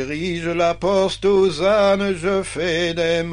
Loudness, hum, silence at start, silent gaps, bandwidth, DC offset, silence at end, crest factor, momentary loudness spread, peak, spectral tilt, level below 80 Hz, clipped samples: -19 LUFS; none; 0 s; none; 10.5 kHz; under 0.1%; 0 s; 12 dB; 6 LU; -6 dBFS; -5 dB/octave; -42 dBFS; under 0.1%